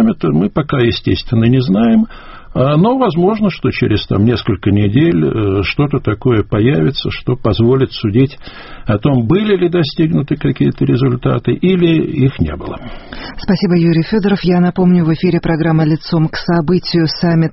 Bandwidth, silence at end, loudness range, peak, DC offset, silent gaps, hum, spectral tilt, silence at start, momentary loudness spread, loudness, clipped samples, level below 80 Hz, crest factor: 6 kHz; 0 s; 2 LU; 0 dBFS; under 0.1%; none; none; -6.5 dB/octave; 0 s; 6 LU; -13 LUFS; under 0.1%; -34 dBFS; 12 dB